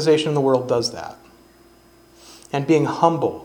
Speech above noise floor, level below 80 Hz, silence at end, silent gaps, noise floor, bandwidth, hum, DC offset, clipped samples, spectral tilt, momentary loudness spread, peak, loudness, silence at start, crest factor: 32 dB; -60 dBFS; 0 s; none; -51 dBFS; 17.5 kHz; 60 Hz at -55 dBFS; under 0.1%; under 0.1%; -6 dB/octave; 11 LU; 0 dBFS; -20 LUFS; 0 s; 20 dB